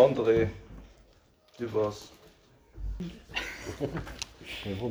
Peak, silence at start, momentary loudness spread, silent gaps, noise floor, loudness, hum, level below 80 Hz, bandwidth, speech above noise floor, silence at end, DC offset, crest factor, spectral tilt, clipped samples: -8 dBFS; 0 s; 21 LU; none; -62 dBFS; -32 LUFS; none; -48 dBFS; over 20 kHz; 32 dB; 0 s; under 0.1%; 22 dB; -5.5 dB/octave; under 0.1%